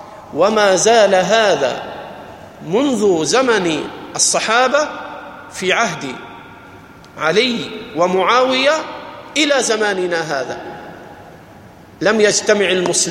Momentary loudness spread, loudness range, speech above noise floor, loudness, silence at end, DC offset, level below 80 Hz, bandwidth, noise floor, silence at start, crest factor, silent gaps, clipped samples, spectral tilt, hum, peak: 19 LU; 4 LU; 25 dB; -15 LUFS; 0 s; under 0.1%; -56 dBFS; 15.5 kHz; -40 dBFS; 0 s; 16 dB; none; under 0.1%; -2.5 dB/octave; none; 0 dBFS